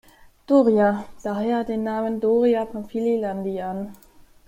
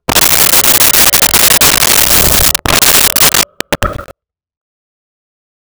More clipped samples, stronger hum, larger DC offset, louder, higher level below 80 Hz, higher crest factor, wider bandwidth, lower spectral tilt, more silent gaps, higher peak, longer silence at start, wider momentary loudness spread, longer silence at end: neither; neither; neither; second, -22 LUFS vs -5 LUFS; second, -56 dBFS vs -28 dBFS; first, 16 dB vs 10 dB; second, 16 kHz vs over 20 kHz; first, -8 dB/octave vs -0.5 dB/octave; neither; second, -6 dBFS vs 0 dBFS; first, 0.5 s vs 0.1 s; about the same, 11 LU vs 11 LU; second, 0.5 s vs 1.6 s